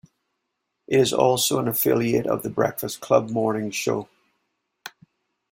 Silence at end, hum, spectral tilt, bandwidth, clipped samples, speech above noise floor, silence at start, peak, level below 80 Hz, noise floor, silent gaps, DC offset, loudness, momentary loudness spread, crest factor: 0.65 s; none; -4.5 dB/octave; 16.5 kHz; under 0.1%; 57 dB; 0.9 s; -4 dBFS; -62 dBFS; -78 dBFS; none; under 0.1%; -22 LUFS; 15 LU; 20 dB